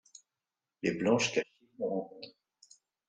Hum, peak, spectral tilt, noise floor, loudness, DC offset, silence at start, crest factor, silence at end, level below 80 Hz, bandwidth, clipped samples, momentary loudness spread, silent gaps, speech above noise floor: none; -14 dBFS; -4 dB/octave; under -90 dBFS; -32 LUFS; under 0.1%; 0.85 s; 22 dB; 0.8 s; -74 dBFS; 9.6 kHz; under 0.1%; 19 LU; none; over 58 dB